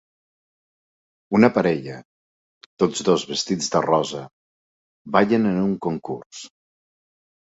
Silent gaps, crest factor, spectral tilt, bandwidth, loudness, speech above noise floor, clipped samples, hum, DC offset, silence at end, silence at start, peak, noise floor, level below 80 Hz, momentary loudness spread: 2.05-2.77 s, 4.33-5.05 s, 6.26-6.30 s; 22 dB; -5 dB/octave; 8 kHz; -21 LUFS; over 69 dB; under 0.1%; none; under 0.1%; 0.95 s; 1.3 s; -2 dBFS; under -90 dBFS; -60 dBFS; 17 LU